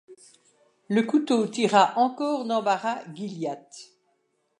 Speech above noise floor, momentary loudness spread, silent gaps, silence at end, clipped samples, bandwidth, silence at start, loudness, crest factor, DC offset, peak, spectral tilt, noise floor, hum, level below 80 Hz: 48 dB; 16 LU; none; 0.75 s; under 0.1%; 11 kHz; 0.1 s; -24 LUFS; 20 dB; under 0.1%; -6 dBFS; -5 dB/octave; -72 dBFS; none; -82 dBFS